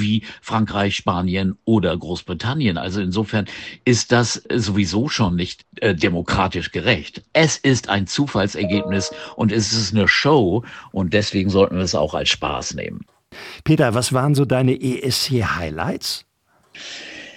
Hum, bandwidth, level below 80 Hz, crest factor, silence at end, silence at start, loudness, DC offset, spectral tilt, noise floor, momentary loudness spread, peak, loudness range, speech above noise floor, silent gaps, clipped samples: none; 16 kHz; -44 dBFS; 18 dB; 0.05 s; 0 s; -19 LUFS; under 0.1%; -5 dB/octave; -52 dBFS; 11 LU; -2 dBFS; 3 LU; 32 dB; none; under 0.1%